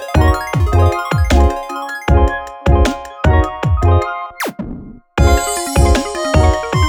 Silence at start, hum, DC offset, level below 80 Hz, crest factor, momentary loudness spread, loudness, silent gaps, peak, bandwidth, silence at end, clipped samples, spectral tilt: 0 s; none; under 0.1%; -18 dBFS; 14 dB; 10 LU; -15 LUFS; none; 0 dBFS; 18.5 kHz; 0 s; under 0.1%; -6 dB/octave